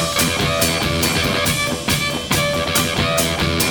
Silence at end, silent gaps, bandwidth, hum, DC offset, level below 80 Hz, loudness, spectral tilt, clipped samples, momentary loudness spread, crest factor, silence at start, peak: 0 s; none; over 20 kHz; none; under 0.1%; -36 dBFS; -17 LUFS; -3 dB/octave; under 0.1%; 2 LU; 18 dB; 0 s; -2 dBFS